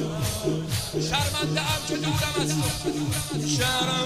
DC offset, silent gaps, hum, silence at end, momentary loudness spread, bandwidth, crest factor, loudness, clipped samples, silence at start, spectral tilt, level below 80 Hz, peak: 0.2%; none; none; 0 s; 5 LU; 16 kHz; 16 dB; -25 LUFS; under 0.1%; 0 s; -4 dB/octave; -44 dBFS; -10 dBFS